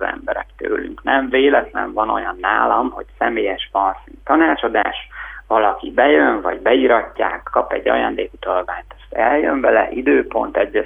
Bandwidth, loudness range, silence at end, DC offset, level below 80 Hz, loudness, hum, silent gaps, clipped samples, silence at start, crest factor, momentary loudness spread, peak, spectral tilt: 3.8 kHz; 2 LU; 0 s; under 0.1%; -44 dBFS; -17 LUFS; none; none; under 0.1%; 0 s; 18 dB; 10 LU; 0 dBFS; -7 dB/octave